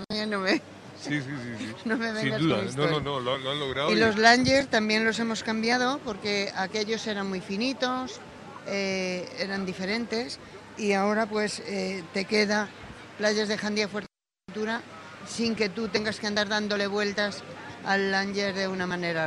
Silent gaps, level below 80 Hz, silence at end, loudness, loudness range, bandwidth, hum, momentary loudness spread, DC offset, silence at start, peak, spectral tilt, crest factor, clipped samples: none; -60 dBFS; 0 s; -27 LUFS; 7 LU; 11.5 kHz; none; 13 LU; under 0.1%; 0 s; -4 dBFS; -4 dB/octave; 24 dB; under 0.1%